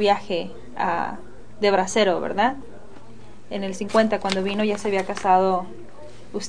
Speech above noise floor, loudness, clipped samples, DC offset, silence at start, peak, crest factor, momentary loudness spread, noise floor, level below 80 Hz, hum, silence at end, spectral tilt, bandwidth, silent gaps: 24 dB; -22 LUFS; under 0.1%; 2%; 0 s; -4 dBFS; 20 dB; 16 LU; -46 dBFS; -54 dBFS; none; 0 s; -4.5 dB/octave; 10 kHz; none